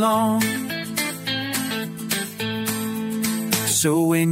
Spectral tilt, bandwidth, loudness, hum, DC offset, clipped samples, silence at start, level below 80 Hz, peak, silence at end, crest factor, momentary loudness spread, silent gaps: -3.5 dB/octave; 16.5 kHz; -22 LUFS; none; under 0.1%; under 0.1%; 0 s; -60 dBFS; -4 dBFS; 0 s; 18 dB; 8 LU; none